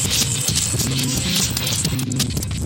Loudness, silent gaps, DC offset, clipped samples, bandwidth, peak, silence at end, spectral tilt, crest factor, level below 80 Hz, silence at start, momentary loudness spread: -19 LUFS; none; under 0.1%; under 0.1%; 18.5 kHz; -6 dBFS; 0 s; -3 dB/octave; 16 dB; -34 dBFS; 0 s; 4 LU